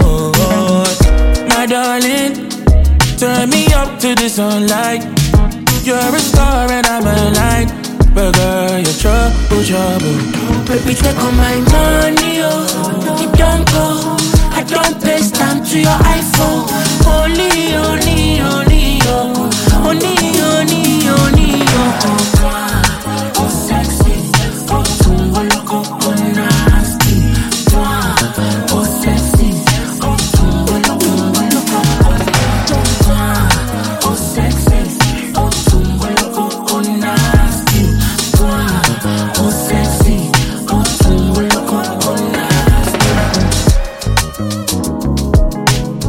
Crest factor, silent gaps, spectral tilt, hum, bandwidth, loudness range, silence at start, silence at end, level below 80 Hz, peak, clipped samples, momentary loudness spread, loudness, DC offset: 10 dB; none; -4.5 dB/octave; none; 17 kHz; 2 LU; 0 s; 0 s; -16 dBFS; 0 dBFS; under 0.1%; 4 LU; -12 LUFS; under 0.1%